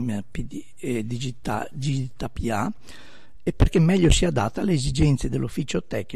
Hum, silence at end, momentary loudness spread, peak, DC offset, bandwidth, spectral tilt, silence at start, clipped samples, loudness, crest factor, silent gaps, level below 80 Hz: none; 0 s; 13 LU; -4 dBFS; 2%; 13.5 kHz; -6 dB/octave; 0 s; under 0.1%; -24 LUFS; 18 dB; none; -32 dBFS